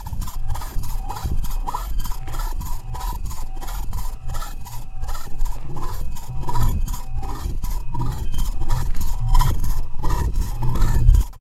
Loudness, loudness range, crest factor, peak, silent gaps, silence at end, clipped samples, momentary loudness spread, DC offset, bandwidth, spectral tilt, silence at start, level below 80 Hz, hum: -27 LUFS; 7 LU; 18 dB; 0 dBFS; none; 0 s; under 0.1%; 11 LU; under 0.1%; 14.5 kHz; -5.5 dB/octave; 0 s; -20 dBFS; none